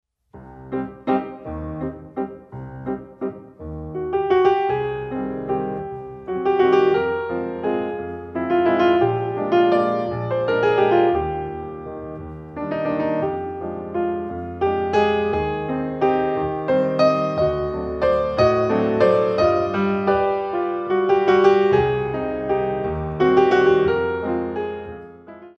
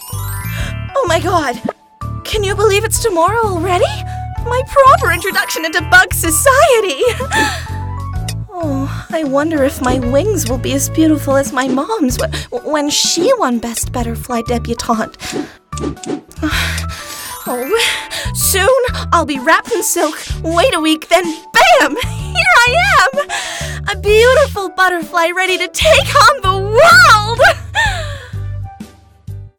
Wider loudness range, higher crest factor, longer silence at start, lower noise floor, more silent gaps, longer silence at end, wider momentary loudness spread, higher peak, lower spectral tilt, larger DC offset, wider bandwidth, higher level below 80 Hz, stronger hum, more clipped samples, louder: about the same, 7 LU vs 7 LU; about the same, 18 dB vs 14 dB; first, 0.35 s vs 0 s; first, -44 dBFS vs -36 dBFS; neither; about the same, 0.1 s vs 0.1 s; about the same, 14 LU vs 15 LU; second, -4 dBFS vs 0 dBFS; first, -8 dB/octave vs -3.5 dB/octave; neither; second, 6.6 kHz vs 19 kHz; second, -44 dBFS vs -30 dBFS; neither; neither; second, -21 LUFS vs -13 LUFS